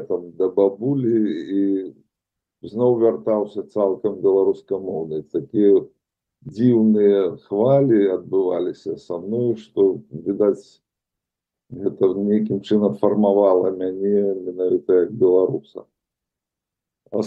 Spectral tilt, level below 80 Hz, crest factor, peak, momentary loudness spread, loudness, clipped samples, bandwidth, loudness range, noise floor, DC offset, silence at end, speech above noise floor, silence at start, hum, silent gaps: -9.5 dB/octave; -68 dBFS; 16 dB; -4 dBFS; 11 LU; -20 LUFS; under 0.1%; 5.6 kHz; 4 LU; -85 dBFS; under 0.1%; 0 s; 66 dB; 0 s; none; none